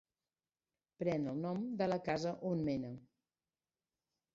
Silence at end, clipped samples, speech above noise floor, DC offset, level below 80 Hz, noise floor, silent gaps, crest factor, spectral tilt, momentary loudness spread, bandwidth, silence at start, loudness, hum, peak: 1.3 s; under 0.1%; over 52 dB; under 0.1%; -72 dBFS; under -90 dBFS; none; 20 dB; -6.5 dB/octave; 5 LU; 7.6 kHz; 1 s; -39 LUFS; none; -22 dBFS